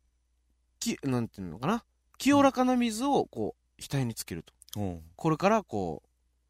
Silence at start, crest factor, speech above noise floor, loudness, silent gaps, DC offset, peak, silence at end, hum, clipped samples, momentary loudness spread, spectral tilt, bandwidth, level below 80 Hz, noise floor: 0.8 s; 20 dB; 44 dB; -30 LUFS; none; under 0.1%; -10 dBFS; 0.55 s; none; under 0.1%; 14 LU; -5.5 dB/octave; 16 kHz; -58 dBFS; -72 dBFS